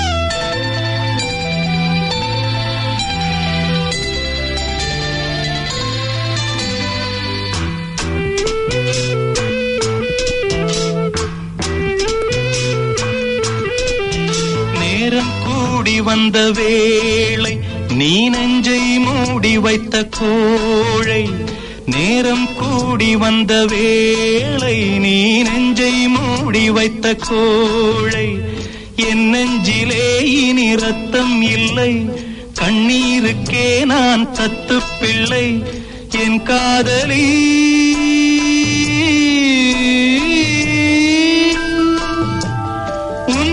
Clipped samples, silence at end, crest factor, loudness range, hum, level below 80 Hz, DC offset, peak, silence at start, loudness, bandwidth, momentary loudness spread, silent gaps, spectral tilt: under 0.1%; 0 s; 14 dB; 6 LU; none; -34 dBFS; under 0.1%; -2 dBFS; 0 s; -14 LUFS; 11 kHz; 7 LU; none; -4.5 dB/octave